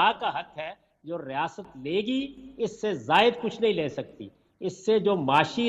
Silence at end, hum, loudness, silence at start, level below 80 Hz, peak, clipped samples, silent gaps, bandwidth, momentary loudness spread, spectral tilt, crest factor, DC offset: 0 s; none; -27 LUFS; 0 s; -64 dBFS; -8 dBFS; under 0.1%; none; 9.6 kHz; 16 LU; -5 dB/octave; 20 dB; under 0.1%